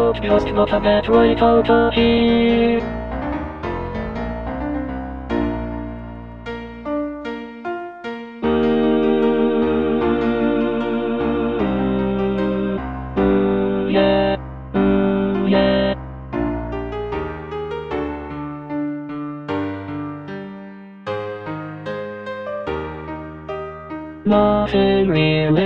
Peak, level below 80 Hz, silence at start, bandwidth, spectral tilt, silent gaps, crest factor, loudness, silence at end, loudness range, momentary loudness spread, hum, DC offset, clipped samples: -2 dBFS; -36 dBFS; 0 s; 6.2 kHz; -8.5 dB/octave; none; 18 dB; -20 LUFS; 0 s; 11 LU; 14 LU; none; under 0.1%; under 0.1%